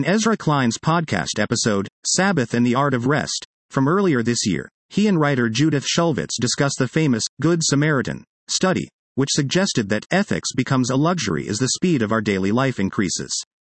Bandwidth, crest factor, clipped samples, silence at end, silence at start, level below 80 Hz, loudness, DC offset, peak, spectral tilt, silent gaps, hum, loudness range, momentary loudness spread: 8.8 kHz; 16 dB; under 0.1%; 0.2 s; 0 s; -56 dBFS; -20 LUFS; under 0.1%; -4 dBFS; -4.5 dB/octave; 1.92-2.03 s, 3.45-3.69 s, 4.71-4.89 s, 7.29-7.37 s, 8.27-8.47 s, 8.93-9.15 s; none; 1 LU; 5 LU